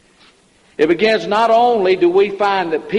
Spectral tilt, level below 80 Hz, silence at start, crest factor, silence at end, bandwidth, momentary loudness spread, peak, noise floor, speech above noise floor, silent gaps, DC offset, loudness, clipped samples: -5.5 dB/octave; -56 dBFS; 0.8 s; 14 dB; 0 s; 10.5 kHz; 6 LU; -2 dBFS; -52 dBFS; 38 dB; none; under 0.1%; -14 LUFS; under 0.1%